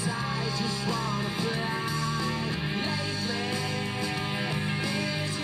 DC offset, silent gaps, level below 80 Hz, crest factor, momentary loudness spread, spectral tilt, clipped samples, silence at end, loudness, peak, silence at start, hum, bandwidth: under 0.1%; none; -54 dBFS; 12 dB; 1 LU; -4.5 dB/octave; under 0.1%; 0 s; -29 LUFS; -16 dBFS; 0 s; none; 14.5 kHz